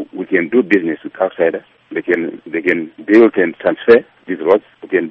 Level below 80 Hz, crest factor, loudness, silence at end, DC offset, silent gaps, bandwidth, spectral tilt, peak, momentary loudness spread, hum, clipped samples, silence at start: -58 dBFS; 14 dB; -15 LUFS; 0 s; under 0.1%; none; 5.8 kHz; -7.5 dB/octave; 0 dBFS; 12 LU; none; under 0.1%; 0 s